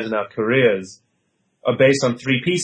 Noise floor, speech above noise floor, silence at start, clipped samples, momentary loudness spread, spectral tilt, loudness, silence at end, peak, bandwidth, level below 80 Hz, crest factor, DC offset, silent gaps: -68 dBFS; 50 dB; 0 s; under 0.1%; 11 LU; -5 dB/octave; -19 LUFS; 0 s; -4 dBFS; 9.4 kHz; -62 dBFS; 16 dB; under 0.1%; none